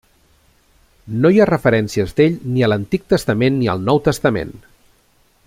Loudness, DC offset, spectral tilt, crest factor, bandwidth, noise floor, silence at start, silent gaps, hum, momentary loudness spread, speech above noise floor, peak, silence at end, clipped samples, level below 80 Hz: -16 LUFS; under 0.1%; -7 dB/octave; 16 dB; 16 kHz; -57 dBFS; 1.05 s; none; none; 7 LU; 41 dB; -2 dBFS; 0.9 s; under 0.1%; -44 dBFS